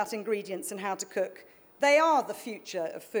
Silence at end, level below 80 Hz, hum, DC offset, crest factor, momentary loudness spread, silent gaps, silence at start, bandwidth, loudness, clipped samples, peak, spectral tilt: 0 s; -86 dBFS; none; under 0.1%; 18 dB; 14 LU; none; 0 s; over 20 kHz; -29 LUFS; under 0.1%; -12 dBFS; -3 dB/octave